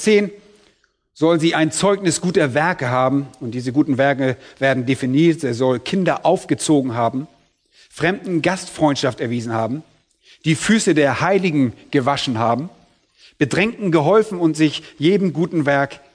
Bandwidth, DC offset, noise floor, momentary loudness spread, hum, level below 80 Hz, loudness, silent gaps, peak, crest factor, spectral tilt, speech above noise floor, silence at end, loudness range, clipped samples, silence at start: 11 kHz; under 0.1%; -60 dBFS; 7 LU; none; -56 dBFS; -18 LUFS; none; -2 dBFS; 16 dB; -5.5 dB/octave; 43 dB; 0.2 s; 2 LU; under 0.1%; 0 s